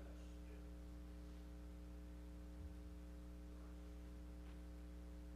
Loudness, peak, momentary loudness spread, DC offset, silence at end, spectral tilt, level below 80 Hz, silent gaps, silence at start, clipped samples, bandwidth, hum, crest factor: -57 LUFS; -44 dBFS; 1 LU; under 0.1%; 0 s; -7 dB/octave; -56 dBFS; none; 0 s; under 0.1%; 15 kHz; none; 10 dB